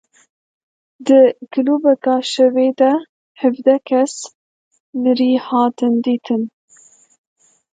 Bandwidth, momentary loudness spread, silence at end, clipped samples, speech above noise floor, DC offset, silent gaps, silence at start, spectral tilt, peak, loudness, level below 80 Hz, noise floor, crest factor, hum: 9.2 kHz; 9 LU; 1.25 s; under 0.1%; 35 dB; under 0.1%; 3.09-3.35 s, 4.35-4.71 s, 4.80-4.93 s; 1 s; -4.5 dB/octave; 0 dBFS; -16 LUFS; -74 dBFS; -50 dBFS; 16 dB; none